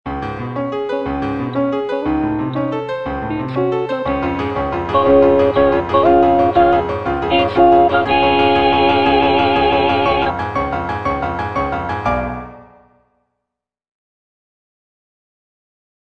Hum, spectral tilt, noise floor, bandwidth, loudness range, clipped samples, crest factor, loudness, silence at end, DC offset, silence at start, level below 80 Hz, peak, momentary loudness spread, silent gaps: none; -7.5 dB/octave; -80 dBFS; 6.8 kHz; 10 LU; under 0.1%; 16 dB; -16 LUFS; 3.4 s; under 0.1%; 0.05 s; -36 dBFS; 0 dBFS; 10 LU; none